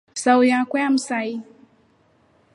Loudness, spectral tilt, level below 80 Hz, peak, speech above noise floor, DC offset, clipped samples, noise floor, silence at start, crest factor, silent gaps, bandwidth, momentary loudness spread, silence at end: -20 LUFS; -3 dB/octave; -74 dBFS; -4 dBFS; 40 dB; under 0.1%; under 0.1%; -59 dBFS; 0.15 s; 18 dB; none; 11 kHz; 12 LU; 1.15 s